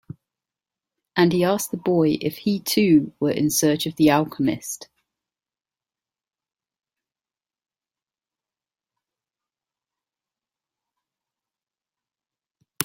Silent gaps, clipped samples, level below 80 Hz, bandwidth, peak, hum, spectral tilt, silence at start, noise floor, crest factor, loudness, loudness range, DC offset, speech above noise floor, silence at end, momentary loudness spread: none; under 0.1%; -62 dBFS; 16.5 kHz; -2 dBFS; none; -5 dB/octave; 1.15 s; under -90 dBFS; 24 dB; -21 LUFS; 10 LU; under 0.1%; over 70 dB; 0 s; 7 LU